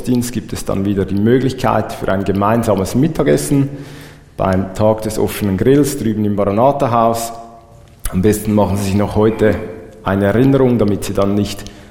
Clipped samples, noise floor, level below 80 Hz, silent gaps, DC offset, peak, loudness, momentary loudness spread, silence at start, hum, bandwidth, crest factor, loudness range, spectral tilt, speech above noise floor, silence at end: under 0.1%; -41 dBFS; -36 dBFS; none; under 0.1%; 0 dBFS; -15 LUFS; 10 LU; 0 s; none; 18 kHz; 14 dB; 2 LU; -6.5 dB/octave; 27 dB; 0.05 s